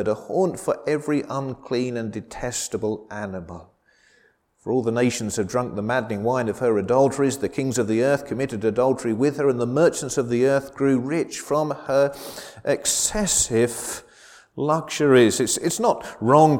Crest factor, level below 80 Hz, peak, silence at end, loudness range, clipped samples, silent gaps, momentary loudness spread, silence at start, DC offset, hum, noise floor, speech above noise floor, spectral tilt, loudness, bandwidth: 20 dB; -52 dBFS; -2 dBFS; 0 s; 7 LU; under 0.1%; none; 12 LU; 0 s; under 0.1%; none; -61 dBFS; 39 dB; -4.5 dB/octave; -22 LUFS; 17.5 kHz